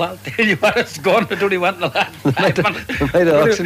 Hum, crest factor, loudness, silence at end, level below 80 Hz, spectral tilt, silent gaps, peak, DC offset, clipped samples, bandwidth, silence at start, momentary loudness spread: none; 12 dB; -16 LUFS; 0 s; -42 dBFS; -5 dB/octave; none; -4 dBFS; under 0.1%; under 0.1%; 15.5 kHz; 0 s; 5 LU